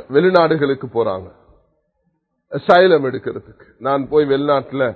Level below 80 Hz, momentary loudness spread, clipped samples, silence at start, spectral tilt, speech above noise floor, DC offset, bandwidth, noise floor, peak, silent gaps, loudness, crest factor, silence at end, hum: -54 dBFS; 16 LU; under 0.1%; 0.1 s; -8 dB/octave; 52 dB; under 0.1%; 6 kHz; -68 dBFS; 0 dBFS; none; -16 LUFS; 18 dB; 0 s; none